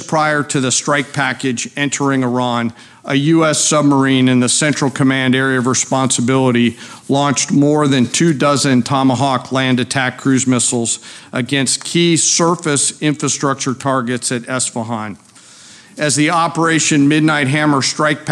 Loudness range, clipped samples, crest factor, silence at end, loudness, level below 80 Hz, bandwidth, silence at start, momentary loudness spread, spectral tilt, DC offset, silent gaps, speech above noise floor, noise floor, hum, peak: 4 LU; under 0.1%; 12 dB; 0 s; -14 LUFS; -62 dBFS; 12.5 kHz; 0 s; 7 LU; -4 dB/octave; under 0.1%; none; 27 dB; -41 dBFS; none; -4 dBFS